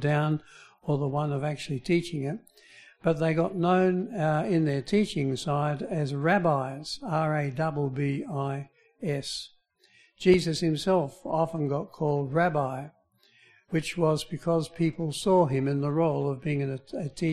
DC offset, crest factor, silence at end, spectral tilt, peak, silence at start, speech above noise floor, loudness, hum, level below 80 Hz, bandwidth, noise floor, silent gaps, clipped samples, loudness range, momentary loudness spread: under 0.1%; 20 dB; 0 s; -6.5 dB/octave; -8 dBFS; 0 s; 36 dB; -28 LUFS; none; -58 dBFS; 13 kHz; -63 dBFS; none; under 0.1%; 3 LU; 10 LU